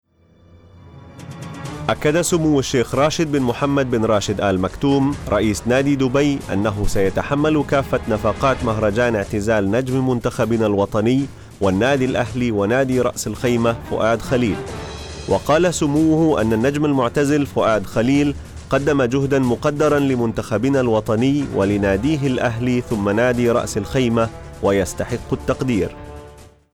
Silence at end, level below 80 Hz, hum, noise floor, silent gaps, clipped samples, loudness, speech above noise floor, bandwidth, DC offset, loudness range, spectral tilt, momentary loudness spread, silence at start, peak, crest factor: 0.3 s; -38 dBFS; none; -52 dBFS; none; under 0.1%; -19 LUFS; 34 dB; 18 kHz; under 0.1%; 2 LU; -6 dB/octave; 6 LU; 0.85 s; -6 dBFS; 14 dB